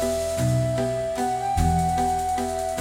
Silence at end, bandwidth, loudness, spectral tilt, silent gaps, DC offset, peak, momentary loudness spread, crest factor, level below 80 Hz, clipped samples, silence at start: 0 s; 16.5 kHz; -24 LUFS; -6 dB/octave; none; under 0.1%; -8 dBFS; 4 LU; 16 dB; -38 dBFS; under 0.1%; 0 s